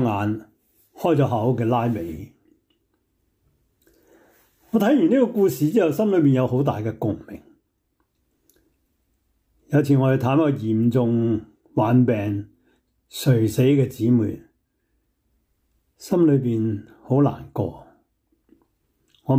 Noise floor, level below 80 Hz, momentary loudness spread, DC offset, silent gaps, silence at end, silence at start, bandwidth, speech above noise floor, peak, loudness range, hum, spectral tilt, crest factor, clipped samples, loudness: -71 dBFS; -58 dBFS; 13 LU; under 0.1%; none; 0 s; 0 s; 16 kHz; 51 dB; -6 dBFS; 6 LU; none; -8 dB/octave; 16 dB; under 0.1%; -21 LUFS